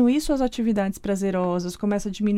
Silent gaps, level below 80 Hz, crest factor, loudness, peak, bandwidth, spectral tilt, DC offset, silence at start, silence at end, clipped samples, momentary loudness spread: none; -42 dBFS; 14 dB; -24 LUFS; -10 dBFS; 16 kHz; -6 dB/octave; under 0.1%; 0 s; 0 s; under 0.1%; 4 LU